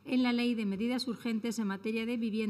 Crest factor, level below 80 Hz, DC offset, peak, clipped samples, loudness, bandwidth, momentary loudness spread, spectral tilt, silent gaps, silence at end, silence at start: 12 dB; -72 dBFS; under 0.1%; -20 dBFS; under 0.1%; -33 LUFS; 14 kHz; 5 LU; -5.5 dB/octave; none; 0 s; 0.05 s